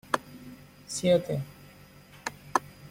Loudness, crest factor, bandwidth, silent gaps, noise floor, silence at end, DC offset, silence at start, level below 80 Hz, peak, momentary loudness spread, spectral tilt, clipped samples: -30 LUFS; 26 dB; 16.5 kHz; none; -52 dBFS; 0 s; under 0.1%; 0.1 s; -62 dBFS; -6 dBFS; 24 LU; -4.5 dB/octave; under 0.1%